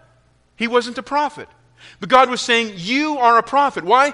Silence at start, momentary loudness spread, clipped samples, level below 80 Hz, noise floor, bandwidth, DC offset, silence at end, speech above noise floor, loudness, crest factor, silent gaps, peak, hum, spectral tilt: 0.6 s; 9 LU; under 0.1%; -58 dBFS; -57 dBFS; 10.5 kHz; under 0.1%; 0 s; 40 dB; -17 LUFS; 18 dB; none; 0 dBFS; none; -3 dB/octave